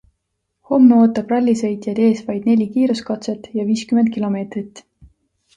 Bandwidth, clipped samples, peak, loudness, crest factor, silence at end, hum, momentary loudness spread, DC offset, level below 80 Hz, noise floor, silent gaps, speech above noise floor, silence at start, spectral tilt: 9.2 kHz; under 0.1%; -2 dBFS; -17 LUFS; 16 dB; 0.8 s; none; 13 LU; under 0.1%; -58 dBFS; -74 dBFS; none; 57 dB; 0.7 s; -7 dB/octave